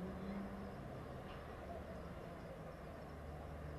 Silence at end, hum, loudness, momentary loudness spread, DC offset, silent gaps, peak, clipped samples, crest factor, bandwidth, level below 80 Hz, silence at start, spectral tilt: 0 s; none; -51 LUFS; 5 LU; under 0.1%; none; -36 dBFS; under 0.1%; 14 dB; 13 kHz; -58 dBFS; 0 s; -7.5 dB/octave